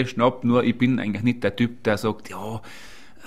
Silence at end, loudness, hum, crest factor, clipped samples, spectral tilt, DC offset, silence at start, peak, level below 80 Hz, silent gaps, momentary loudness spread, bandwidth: 0 s; -23 LUFS; none; 18 dB; under 0.1%; -7 dB/octave; 0.9%; 0 s; -6 dBFS; -54 dBFS; none; 15 LU; 14 kHz